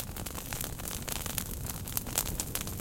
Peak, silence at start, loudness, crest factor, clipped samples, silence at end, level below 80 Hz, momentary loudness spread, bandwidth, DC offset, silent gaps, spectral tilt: -8 dBFS; 0 s; -35 LUFS; 30 dB; under 0.1%; 0 s; -44 dBFS; 6 LU; 17 kHz; under 0.1%; none; -3 dB/octave